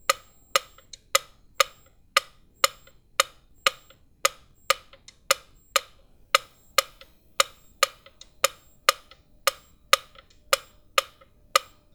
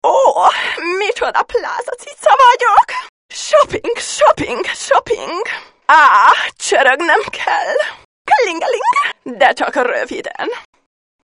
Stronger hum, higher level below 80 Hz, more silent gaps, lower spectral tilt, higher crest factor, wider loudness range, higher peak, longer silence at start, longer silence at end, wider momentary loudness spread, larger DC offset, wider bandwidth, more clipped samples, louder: neither; second, -60 dBFS vs -52 dBFS; second, none vs 3.09-3.29 s, 8.05-8.25 s; second, 2 dB/octave vs -1.5 dB/octave; first, 30 dB vs 14 dB; second, 1 LU vs 4 LU; about the same, 0 dBFS vs 0 dBFS; about the same, 0.1 s vs 0.05 s; second, 0.35 s vs 0.65 s; second, 3 LU vs 14 LU; neither; first, over 20 kHz vs 11 kHz; second, under 0.1% vs 0.2%; second, -26 LUFS vs -13 LUFS